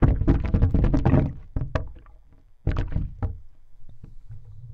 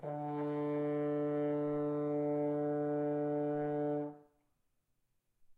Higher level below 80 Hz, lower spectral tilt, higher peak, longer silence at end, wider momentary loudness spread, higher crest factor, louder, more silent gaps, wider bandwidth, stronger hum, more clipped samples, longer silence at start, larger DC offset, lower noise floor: first, -28 dBFS vs -82 dBFS; about the same, -10 dB/octave vs -10.5 dB/octave; first, -6 dBFS vs -28 dBFS; about the same, 0 s vs 0.05 s; first, 23 LU vs 3 LU; first, 18 dB vs 8 dB; first, -25 LUFS vs -36 LUFS; neither; first, 6 kHz vs 3.9 kHz; neither; neither; about the same, 0 s vs 0 s; neither; second, -50 dBFS vs -80 dBFS